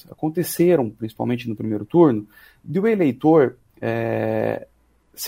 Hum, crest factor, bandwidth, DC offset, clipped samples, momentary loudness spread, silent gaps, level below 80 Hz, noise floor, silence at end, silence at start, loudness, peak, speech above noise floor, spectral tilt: none; 18 dB; 16 kHz; under 0.1%; under 0.1%; 11 LU; none; -60 dBFS; -45 dBFS; 0 s; 0.1 s; -21 LUFS; -2 dBFS; 25 dB; -7 dB/octave